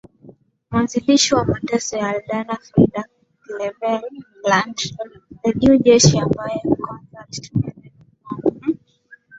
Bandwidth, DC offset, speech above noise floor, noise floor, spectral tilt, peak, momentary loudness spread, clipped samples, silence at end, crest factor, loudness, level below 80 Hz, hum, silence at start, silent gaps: 8 kHz; under 0.1%; 32 dB; -50 dBFS; -4.5 dB/octave; -2 dBFS; 19 LU; under 0.1%; 0 s; 18 dB; -19 LUFS; -46 dBFS; none; 0.25 s; none